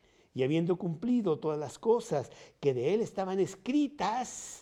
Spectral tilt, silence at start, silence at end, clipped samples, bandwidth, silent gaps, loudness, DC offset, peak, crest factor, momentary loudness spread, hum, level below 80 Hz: -6 dB/octave; 0.35 s; 0 s; under 0.1%; 12.5 kHz; none; -32 LUFS; under 0.1%; -16 dBFS; 16 dB; 6 LU; none; -70 dBFS